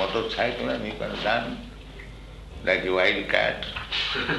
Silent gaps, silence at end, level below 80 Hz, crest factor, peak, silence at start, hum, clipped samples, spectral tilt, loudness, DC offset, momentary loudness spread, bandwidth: none; 0 s; -44 dBFS; 24 dB; -4 dBFS; 0 s; none; under 0.1%; -4.5 dB/octave; -25 LUFS; under 0.1%; 20 LU; 12 kHz